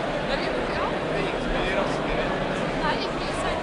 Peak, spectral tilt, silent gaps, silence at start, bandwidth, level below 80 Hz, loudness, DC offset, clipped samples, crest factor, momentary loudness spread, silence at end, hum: -10 dBFS; -5 dB/octave; none; 0 s; 11 kHz; -38 dBFS; -26 LUFS; under 0.1%; under 0.1%; 16 dB; 2 LU; 0 s; none